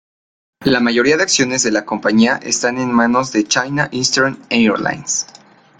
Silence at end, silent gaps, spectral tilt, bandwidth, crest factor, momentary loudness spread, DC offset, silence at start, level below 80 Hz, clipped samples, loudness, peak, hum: 0.55 s; none; -3 dB/octave; 9.6 kHz; 14 dB; 6 LU; under 0.1%; 0.6 s; -54 dBFS; under 0.1%; -15 LUFS; -2 dBFS; none